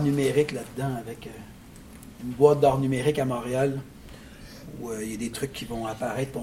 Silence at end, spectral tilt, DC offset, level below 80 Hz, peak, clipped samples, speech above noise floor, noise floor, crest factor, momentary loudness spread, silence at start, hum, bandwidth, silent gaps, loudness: 0 s; -6 dB/octave; under 0.1%; -50 dBFS; -4 dBFS; under 0.1%; 20 dB; -46 dBFS; 22 dB; 24 LU; 0 s; none; 16.5 kHz; none; -26 LUFS